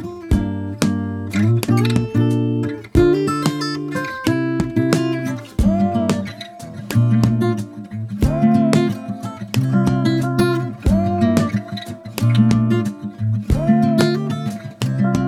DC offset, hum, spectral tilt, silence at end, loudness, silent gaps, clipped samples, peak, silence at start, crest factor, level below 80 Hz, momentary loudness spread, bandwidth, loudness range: under 0.1%; none; -7 dB/octave; 0 s; -18 LUFS; none; under 0.1%; 0 dBFS; 0 s; 16 dB; -32 dBFS; 11 LU; 14.5 kHz; 2 LU